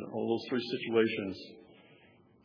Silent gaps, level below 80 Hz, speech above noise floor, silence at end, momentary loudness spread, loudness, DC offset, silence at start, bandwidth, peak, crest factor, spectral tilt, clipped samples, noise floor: none; -80 dBFS; 29 dB; 0.7 s; 15 LU; -33 LUFS; under 0.1%; 0 s; 5.4 kHz; -14 dBFS; 20 dB; -7 dB/octave; under 0.1%; -62 dBFS